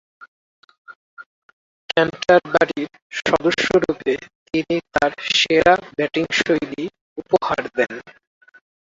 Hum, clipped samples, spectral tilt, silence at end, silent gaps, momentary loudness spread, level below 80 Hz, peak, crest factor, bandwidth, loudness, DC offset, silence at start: none; under 0.1%; -4 dB/octave; 0.75 s; 0.28-0.68 s, 0.78-0.85 s, 0.96-1.17 s, 1.26-1.89 s, 3.02-3.10 s, 4.35-4.46 s, 7.01-7.16 s; 13 LU; -52 dBFS; -2 dBFS; 20 dB; 7.8 kHz; -19 LUFS; under 0.1%; 0.2 s